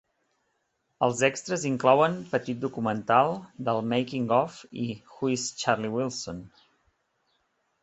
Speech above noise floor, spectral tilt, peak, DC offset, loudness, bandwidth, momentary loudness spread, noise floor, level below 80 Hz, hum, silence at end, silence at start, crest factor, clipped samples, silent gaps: 49 dB; -5 dB/octave; -6 dBFS; under 0.1%; -27 LUFS; 8.4 kHz; 12 LU; -76 dBFS; -64 dBFS; none; 1.35 s; 1 s; 22 dB; under 0.1%; none